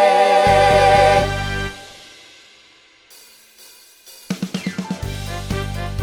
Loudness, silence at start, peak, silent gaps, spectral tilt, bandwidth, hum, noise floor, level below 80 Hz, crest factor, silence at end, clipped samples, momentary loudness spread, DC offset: -17 LUFS; 0 s; 0 dBFS; none; -4.5 dB/octave; 18 kHz; none; -50 dBFS; -34 dBFS; 18 dB; 0 s; under 0.1%; 16 LU; under 0.1%